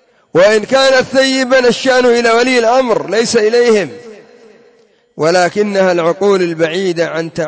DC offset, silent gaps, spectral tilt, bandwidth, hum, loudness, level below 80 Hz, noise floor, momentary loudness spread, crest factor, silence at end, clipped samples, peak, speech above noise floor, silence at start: under 0.1%; none; -4 dB/octave; 8 kHz; none; -11 LUFS; -56 dBFS; -50 dBFS; 6 LU; 12 dB; 0 s; under 0.1%; 0 dBFS; 39 dB; 0.35 s